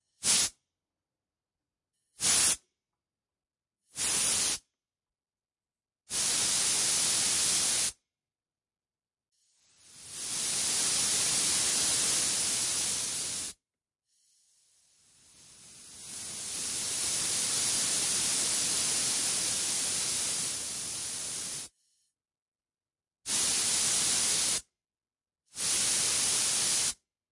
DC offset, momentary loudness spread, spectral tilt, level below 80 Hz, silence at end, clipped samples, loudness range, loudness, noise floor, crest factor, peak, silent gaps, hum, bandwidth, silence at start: under 0.1%; 11 LU; 1 dB/octave; -66 dBFS; 0.35 s; under 0.1%; 7 LU; -27 LUFS; under -90 dBFS; 20 dB; -12 dBFS; 22.42-22.52 s; none; 11.5 kHz; 0.2 s